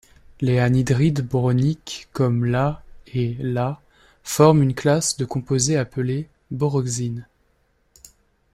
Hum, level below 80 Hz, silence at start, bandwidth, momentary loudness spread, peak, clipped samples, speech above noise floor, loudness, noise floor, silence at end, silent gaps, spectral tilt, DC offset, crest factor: none; -48 dBFS; 0.4 s; 15.5 kHz; 13 LU; -2 dBFS; under 0.1%; 44 dB; -21 LUFS; -64 dBFS; 1.3 s; none; -6 dB/octave; under 0.1%; 20 dB